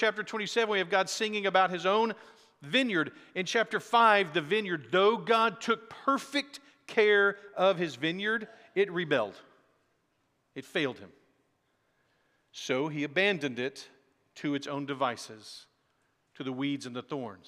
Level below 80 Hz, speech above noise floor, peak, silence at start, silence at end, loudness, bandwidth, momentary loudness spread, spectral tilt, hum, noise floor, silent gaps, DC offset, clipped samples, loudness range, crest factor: -88 dBFS; 45 dB; -8 dBFS; 0 s; 0.1 s; -29 LUFS; 13.5 kHz; 16 LU; -4 dB/octave; none; -75 dBFS; none; under 0.1%; under 0.1%; 10 LU; 22 dB